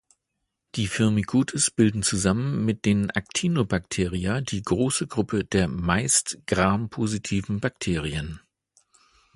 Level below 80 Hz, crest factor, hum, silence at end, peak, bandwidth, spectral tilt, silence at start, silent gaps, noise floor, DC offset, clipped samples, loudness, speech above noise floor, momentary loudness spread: -44 dBFS; 22 dB; none; 1 s; -4 dBFS; 11.5 kHz; -4.5 dB/octave; 0.75 s; none; -80 dBFS; under 0.1%; under 0.1%; -24 LUFS; 56 dB; 7 LU